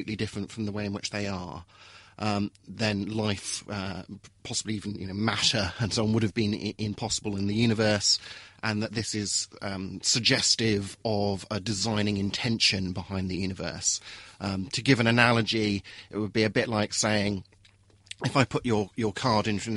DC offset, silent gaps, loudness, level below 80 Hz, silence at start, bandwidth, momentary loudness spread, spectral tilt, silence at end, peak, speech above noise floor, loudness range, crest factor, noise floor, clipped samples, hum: under 0.1%; none; -27 LUFS; -56 dBFS; 0 s; 11.5 kHz; 12 LU; -4 dB/octave; 0 s; -4 dBFS; 31 dB; 6 LU; 24 dB; -59 dBFS; under 0.1%; none